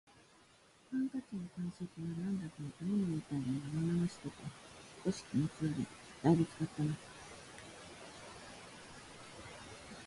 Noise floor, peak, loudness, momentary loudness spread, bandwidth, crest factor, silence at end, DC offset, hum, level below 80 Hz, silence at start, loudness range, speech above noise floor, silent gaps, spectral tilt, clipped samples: -65 dBFS; -16 dBFS; -39 LUFS; 16 LU; 11.5 kHz; 24 dB; 0 s; under 0.1%; none; -66 dBFS; 0.9 s; 5 LU; 28 dB; none; -7 dB/octave; under 0.1%